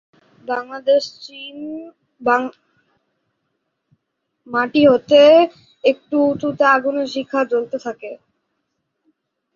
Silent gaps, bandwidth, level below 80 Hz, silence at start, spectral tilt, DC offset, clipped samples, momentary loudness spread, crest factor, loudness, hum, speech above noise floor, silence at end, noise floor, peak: none; 7.2 kHz; -64 dBFS; 0.45 s; -5 dB/octave; under 0.1%; under 0.1%; 20 LU; 18 dB; -16 LUFS; none; 58 dB; 1.4 s; -74 dBFS; -2 dBFS